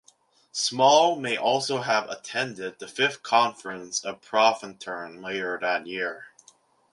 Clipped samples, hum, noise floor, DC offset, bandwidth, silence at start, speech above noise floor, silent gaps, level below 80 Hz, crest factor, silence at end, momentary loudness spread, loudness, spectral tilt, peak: under 0.1%; none; -61 dBFS; under 0.1%; 11.5 kHz; 0.55 s; 36 dB; none; -74 dBFS; 20 dB; 0.65 s; 15 LU; -25 LUFS; -2.5 dB/octave; -6 dBFS